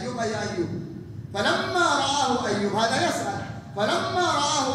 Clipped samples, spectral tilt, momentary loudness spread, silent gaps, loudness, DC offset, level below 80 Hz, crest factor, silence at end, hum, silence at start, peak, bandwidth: under 0.1%; -3.5 dB/octave; 12 LU; none; -24 LUFS; under 0.1%; -58 dBFS; 16 dB; 0 s; none; 0 s; -8 dBFS; 15.5 kHz